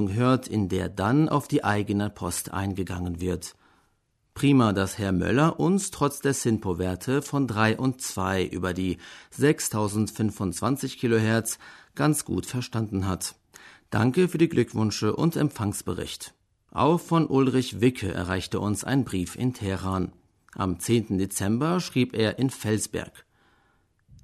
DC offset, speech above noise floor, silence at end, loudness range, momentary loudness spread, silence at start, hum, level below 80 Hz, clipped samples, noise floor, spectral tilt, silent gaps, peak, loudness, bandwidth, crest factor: under 0.1%; 45 dB; 1 s; 3 LU; 9 LU; 0 s; none; -54 dBFS; under 0.1%; -70 dBFS; -5.5 dB/octave; none; -6 dBFS; -26 LUFS; 13.5 kHz; 20 dB